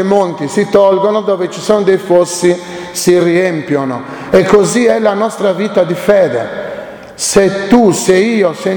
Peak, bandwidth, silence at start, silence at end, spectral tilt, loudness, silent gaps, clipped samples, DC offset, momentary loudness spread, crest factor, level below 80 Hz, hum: 0 dBFS; 20 kHz; 0 s; 0 s; -5 dB/octave; -11 LUFS; none; 0.3%; under 0.1%; 10 LU; 10 dB; -46 dBFS; none